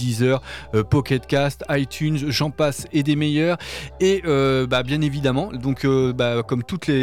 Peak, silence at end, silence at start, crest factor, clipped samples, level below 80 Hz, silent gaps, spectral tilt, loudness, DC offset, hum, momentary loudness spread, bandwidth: -8 dBFS; 0 s; 0 s; 12 dB; under 0.1%; -44 dBFS; none; -6 dB/octave; -21 LUFS; under 0.1%; none; 5 LU; 16 kHz